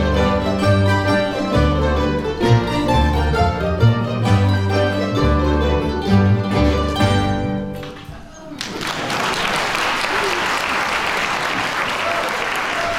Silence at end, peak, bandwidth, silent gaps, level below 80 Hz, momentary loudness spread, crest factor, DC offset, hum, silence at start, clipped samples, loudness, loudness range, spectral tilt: 0 s; -2 dBFS; 15.5 kHz; none; -28 dBFS; 7 LU; 16 dB; under 0.1%; none; 0 s; under 0.1%; -18 LUFS; 4 LU; -5.5 dB/octave